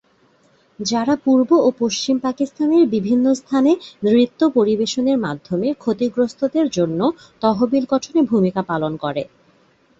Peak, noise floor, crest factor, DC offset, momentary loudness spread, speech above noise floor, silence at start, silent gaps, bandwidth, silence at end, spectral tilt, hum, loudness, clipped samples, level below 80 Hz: -2 dBFS; -57 dBFS; 16 dB; under 0.1%; 7 LU; 39 dB; 0.8 s; none; 8 kHz; 0.75 s; -5.5 dB/octave; none; -18 LUFS; under 0.1%; -58 dBFS